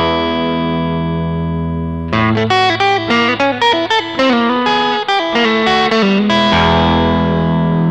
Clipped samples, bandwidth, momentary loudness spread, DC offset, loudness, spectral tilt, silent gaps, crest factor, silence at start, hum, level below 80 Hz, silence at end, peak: under 0.1%; 9 kHz; 6 LU; 0.3%; -13 LUFS; -6 dB/octave; none; 12 dB; 0 s; none; -32 dBFS; 0 s; -2 dBFS